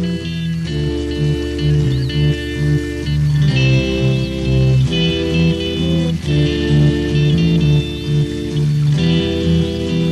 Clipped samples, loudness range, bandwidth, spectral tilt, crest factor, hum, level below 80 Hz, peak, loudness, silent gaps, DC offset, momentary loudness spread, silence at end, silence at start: under 0.1%; 2 LU; 11 kHz; -7 dB/octave; 12 dB; none; -28 dBFS; -4 dBFS; -16 LUFS; none; under 0.1%; 6 LU; 0 s; 0 s